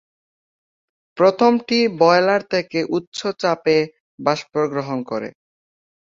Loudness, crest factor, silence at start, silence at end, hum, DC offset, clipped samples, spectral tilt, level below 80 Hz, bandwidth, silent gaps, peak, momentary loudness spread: -19 LUFS; 18 dB; 1.15 s; 0.85 s; none; under 0.1%; under 0.1%; -5.5 dB/octave; -64 dBFS; 7.6 kHz; 3.07-3.12 s, 4.00-4.18 s; -2 dBFS; 11 LU